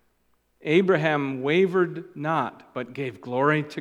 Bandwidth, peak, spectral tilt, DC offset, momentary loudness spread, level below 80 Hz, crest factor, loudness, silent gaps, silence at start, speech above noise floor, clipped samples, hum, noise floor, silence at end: 9.8 kHz; -6 dBFS; -7.5 dB/octave; under 0.1%; 12 LU; -74 dBFS; 18 dB; -24 LUFS; none; 0.65 s; 44 dB; under 0.1%; none; -68 dBFS; 0 s